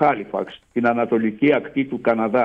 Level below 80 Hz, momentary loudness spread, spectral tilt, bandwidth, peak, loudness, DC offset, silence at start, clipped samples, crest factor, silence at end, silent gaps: -60 dBFS; 9 LU; -8.5 dB/octave; 5.6 kHz; -4 dBFS; -21 LUFS; under 0.1%; 0 s; under 0.1%; 16 dB; 0 s; none